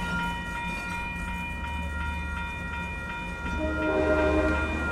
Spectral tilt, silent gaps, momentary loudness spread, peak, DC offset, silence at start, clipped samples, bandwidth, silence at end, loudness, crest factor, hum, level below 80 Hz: -6 dB/octave; none; 9 LU; -12 dBFS; under 0.1%; 0 s; under 0.1%; 14 kHz; 0 s; -29 LUFS; 16 dB; none; -36 dBFS